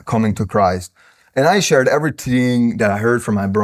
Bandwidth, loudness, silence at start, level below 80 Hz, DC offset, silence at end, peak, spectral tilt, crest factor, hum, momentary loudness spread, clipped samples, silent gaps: 15.5 kHz; -16 LUFS; 0.05 s; -42 dBFS; under 0.1%; 0 s; -2 dBFS; -5.5 dB/octave; 14 dB; none; 5 LU; under 0.1%; none